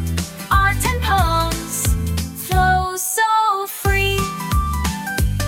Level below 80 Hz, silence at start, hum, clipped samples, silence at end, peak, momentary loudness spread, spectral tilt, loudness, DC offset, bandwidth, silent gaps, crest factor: -24 dBFS; 0 s; none; under 0.1%; 0 s; -4 dBFS; 6 LU; -4 dB/octave; -19 LUFS; under 0.1%; 18.5 kHz; none; 16 dB